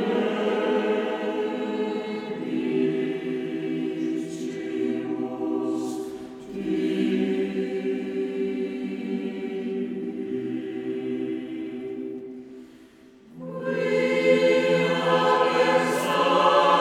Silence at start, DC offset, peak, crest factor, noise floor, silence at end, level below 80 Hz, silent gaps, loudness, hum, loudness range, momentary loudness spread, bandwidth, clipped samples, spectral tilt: 0 s; under 0.1%; -6 dBFS; 18 dB; -51 dBFS; 0 s; -68 dBFS; none; -25 LUFS; none; 9 LU; 13 LU; 15.5 kHz; under 0.1%; -5.5 dB/octave